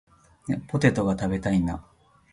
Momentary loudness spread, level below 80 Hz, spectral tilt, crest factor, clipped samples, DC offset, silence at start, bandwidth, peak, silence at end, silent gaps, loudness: 12 LU; -46 dBFS; -7 dB/octave; 22 dB; under 0.1%; under 0.1%; 0.45 s; 11.5 kHz; -6 dBFS; 0.5 s; none; -25 LUFS